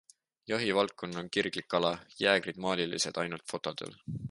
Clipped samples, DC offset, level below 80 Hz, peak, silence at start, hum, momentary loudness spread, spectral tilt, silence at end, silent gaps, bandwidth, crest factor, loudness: under 0.1%; under 0.1%; -66 dBFS; -10 dBFS; 0.5 s; none; 12 LU; -3.5 dB/octave; 0 s; none; 11.5 kHz; 24 dB; -32 LUFS